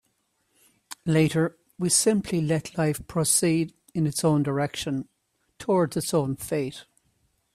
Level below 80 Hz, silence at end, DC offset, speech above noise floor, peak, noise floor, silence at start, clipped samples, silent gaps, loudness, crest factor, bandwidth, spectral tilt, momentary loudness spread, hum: -58 dBFS; 0.75 s; under 0.1%; 48 dB; -8 dBFS; -72 dBFS; 0.9 s; under 0.1%; none; -25 LUFS; 18 dB; 15.5 kHz; -4.5 dB/octave; 12 LU; none